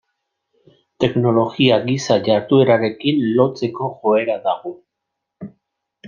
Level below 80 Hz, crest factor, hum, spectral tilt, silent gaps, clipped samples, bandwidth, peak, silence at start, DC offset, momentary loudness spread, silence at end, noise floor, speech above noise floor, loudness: -58 dBFS; 16 dB; none; -6.5 dB/octave; none; under 0.1%; 7.4 kHz; -2 dBFS; 1 s; under 0.1%; 17 LU; 0 s; -79 dBFS; 63 dB; -17 LUFS